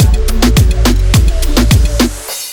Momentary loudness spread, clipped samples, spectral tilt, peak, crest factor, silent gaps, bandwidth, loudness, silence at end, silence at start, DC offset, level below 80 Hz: 4 LU; under 0.1%; -5 dB/octave; 0 dBFS; 10 dB; none; 19 kHz; -11 LUFS; 0 s; 0 s; under 0.1%; -12 dBFS